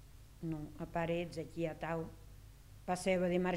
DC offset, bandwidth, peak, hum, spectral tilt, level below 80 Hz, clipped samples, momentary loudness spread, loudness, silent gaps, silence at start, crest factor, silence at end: under 0.1%; 16 kHz; -22 dBFS; none; -6 dB/octave; -58 dBFS; under 0.1%; 24 LU; -39 LUFS; none; 0 s; 18 dB; 0 s